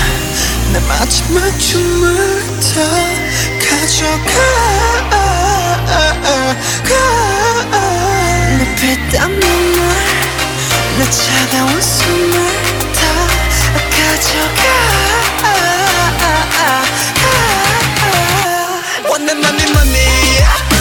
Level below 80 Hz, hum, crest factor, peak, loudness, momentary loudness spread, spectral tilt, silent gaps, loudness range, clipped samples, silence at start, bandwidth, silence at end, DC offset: -20 dBFS; none; 12 dB; 0 dBFS; -11 LUFS; 4 LU; -3 dB/octave; none; 1 LU; under 0.1%; 0 s; 19.5 kHz; 0 s; under 0.1%